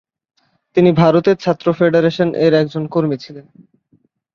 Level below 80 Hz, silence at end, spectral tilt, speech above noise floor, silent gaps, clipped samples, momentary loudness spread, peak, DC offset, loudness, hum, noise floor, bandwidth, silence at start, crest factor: -56 dBFS; 0.95 s; -8 dB/octave; 45 dB; none; under 0.1%; 9 LU; 0 dBFS; under 0.1%; -15 LUFS; none; -59 dBFS; 7 kHz; 0.75 s; 16 dB